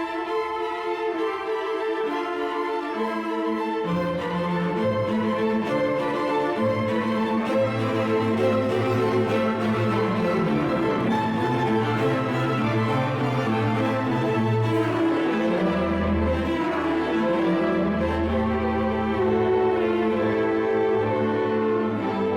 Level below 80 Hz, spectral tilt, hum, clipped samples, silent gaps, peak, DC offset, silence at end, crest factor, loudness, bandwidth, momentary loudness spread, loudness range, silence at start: -48 dBFS; -7.5 dB/octave; none; under 0.1%; none; -12 dBFS; under 0.1%; 0 s; 12 dB; -24 LUFS; 14 kHz; 4 LU; 3 LU; 0 s